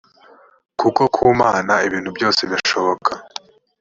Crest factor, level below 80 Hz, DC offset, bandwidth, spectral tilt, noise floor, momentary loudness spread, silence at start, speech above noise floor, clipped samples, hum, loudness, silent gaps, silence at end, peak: 18 dB; -52 dBFS; under 0.1%; 7.6 kHz; -4 dB/octave; -49 dBFS; 16 LU; 0.8 s; 32 dB; under 0.1%; none; -17 LUFS; none; 0.55 s; -2 dBFS